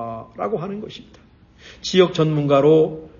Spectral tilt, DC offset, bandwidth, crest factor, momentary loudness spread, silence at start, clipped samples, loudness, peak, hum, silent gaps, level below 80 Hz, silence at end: -6.5 dB/octave; under 0.1%; 7.2 kHz; 18 dB; 18 LU; 0 s; under 0.1%; -18 LUFS; -2 dBFS; none; none; -54 dBFS; 0.1 s